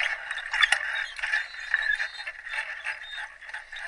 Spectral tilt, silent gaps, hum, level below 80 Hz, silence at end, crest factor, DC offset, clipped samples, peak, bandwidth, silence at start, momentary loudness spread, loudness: 3 dB/octave; none; none; -60 dBFS; 0 s; 26 dB; under 0.1%; under 0.1%; -6 dBFS; 11.5 kHz; 0 s; 15 LU; -28 LUFS